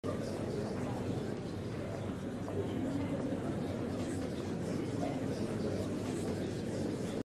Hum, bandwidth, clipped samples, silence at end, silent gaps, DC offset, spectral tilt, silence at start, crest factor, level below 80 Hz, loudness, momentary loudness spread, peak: none; 13 kHz; under 0.1%; 0 s; none; under 0.1%; -7 dB/octave; 0.05 s; 12 dB; -58 dBFS; -38 LUFS; 3 LU; -24 dBFS